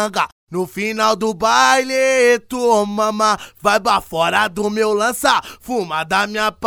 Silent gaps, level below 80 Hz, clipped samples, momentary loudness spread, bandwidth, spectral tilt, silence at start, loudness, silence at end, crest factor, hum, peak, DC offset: 0.32-0.47 s; -50 dBFS; under 0.1%; 8 LU; 19.5 kHz; -3 dB/octave; 0 s; -17 LUFS; 0 s; 16 dB; none; 0 dBFS; under 0.1%